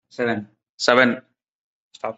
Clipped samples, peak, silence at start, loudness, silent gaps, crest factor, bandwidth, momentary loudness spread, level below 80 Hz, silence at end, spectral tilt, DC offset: under 0.1%; 0 dBFS; 0.2 s; -20 LUFS; 0.69-0.78 s, 1.52-1.91 s; 24 dB; 8.4 kHz; 16 LU; -66 dBFS; 0.05 s; -4 dB/octave; under 0.1%